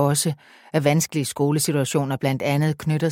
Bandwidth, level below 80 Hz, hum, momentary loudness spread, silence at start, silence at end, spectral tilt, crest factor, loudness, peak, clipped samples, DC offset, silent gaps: 17 kHz; -60 dBFS; none; 5 LU; 0 s; 0 s; -5 dB/octave; 18 dB; -22 LUFS; -4 dBFS; under 0.1%; under 0.1%; none